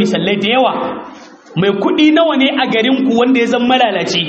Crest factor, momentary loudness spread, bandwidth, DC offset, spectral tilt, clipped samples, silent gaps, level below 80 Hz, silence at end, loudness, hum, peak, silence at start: 12 dB; 8 LU; 8.2 kHz; under 0.1%; -5 dB/octave; under 0.1%; none; -56 dBFS; 0 s; -12 LUFS; none; 0 dBFS; 0 s